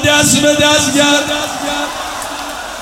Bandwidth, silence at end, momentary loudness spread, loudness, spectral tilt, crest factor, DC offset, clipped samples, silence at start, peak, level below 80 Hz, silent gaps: 17 kHz; 0 s; 13 LU; -12 LUFS; -2.5 dB/octave; 14 dB; under 0.1%; under 0.1%; 0 s; 0 dBFS; -42 dBFS; none